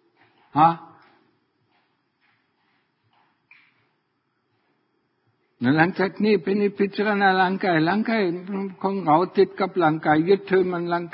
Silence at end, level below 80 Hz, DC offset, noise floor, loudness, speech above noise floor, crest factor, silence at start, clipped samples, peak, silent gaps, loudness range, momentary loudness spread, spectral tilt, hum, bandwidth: 0.05 s; -66 dBFS; under 0.1%; -72 dBFS; -21 LUFS; 51 dB; 22 dB; 0.55 s; under 0.1%; -2 dBFS; none; 7 LU; 8 LU; -11 dB/octave; none; 5.6 kHz